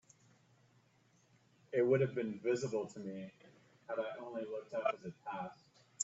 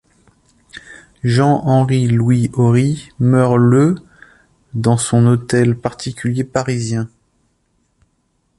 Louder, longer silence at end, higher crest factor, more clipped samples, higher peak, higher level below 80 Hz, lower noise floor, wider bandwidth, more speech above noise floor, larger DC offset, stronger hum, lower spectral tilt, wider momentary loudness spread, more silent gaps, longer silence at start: second, -39 LUFS vs -15 LUFS; second, 0 s vs 1.5 s; first, 20 dB vs 14 dB; neither; second, -20 dBFS vs -2 dBFS; second, -82 dBFS vs -48 dBFS; first, -71 dBFS vs -64 dBFS; second, 8 kHz vs 11.5 kHz; second, 33 dB vs 50 dB; neither; neither; second, -5.5 dB/octave vs -7 dB/octave; first, 15 LU vs 11 LU; neither; first, 1.7 s vs 0.75 s